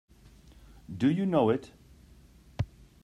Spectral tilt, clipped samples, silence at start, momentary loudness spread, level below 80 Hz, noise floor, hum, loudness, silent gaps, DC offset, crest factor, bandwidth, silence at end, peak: -8.5 dB/octave; under 0.1%; 0.9 s; 17 LU; -54 dBFS; -56 dBFS; none; -29 LUFS; none; under 0.1%; 20 dB; 12 kHz; 0.4 s; -12 dBFS